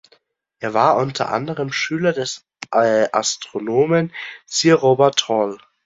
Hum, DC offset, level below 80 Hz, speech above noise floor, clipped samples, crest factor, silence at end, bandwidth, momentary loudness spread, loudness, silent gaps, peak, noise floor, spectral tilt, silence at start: none; under 0.1%; -62 dBFS; 41 dB; under 0.1%; 18 dB; 0.3 s; 7.8 kHz; 11 LU; -18 LUFS; none; -2 dBFS; -59 dBFS; -4 dB/octave; 0.6 s